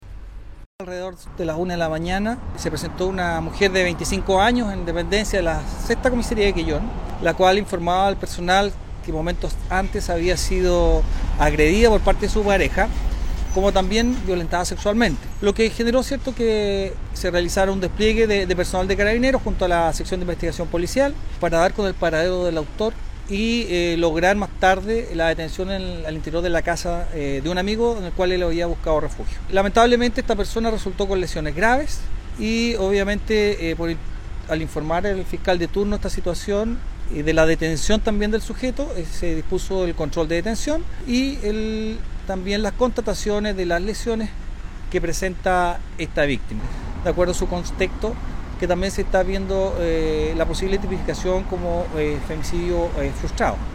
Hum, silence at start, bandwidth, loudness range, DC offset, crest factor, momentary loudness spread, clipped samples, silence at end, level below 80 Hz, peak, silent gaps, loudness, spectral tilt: none; 0 s; 16 kHz; 4 LU; under 0.1%; 18 dB; 9 LU; under 0.1%; 0 s; -28 dBFS; -2 dBFS; 0.66-0.79 s; -22 LUFS; -5 dB/octave